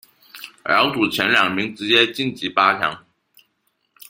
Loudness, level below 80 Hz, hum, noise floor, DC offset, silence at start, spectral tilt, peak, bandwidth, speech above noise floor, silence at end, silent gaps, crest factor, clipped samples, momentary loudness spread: -18 LUFS; -62 dBFS; none; -69 dBFS; under 0.1%; 0.35 s; -4 dB/octave; 0 dBFS; 16.5 kHz; 51 dB; 1.1 s; none; 20 dB; under 0.1%; 16 LU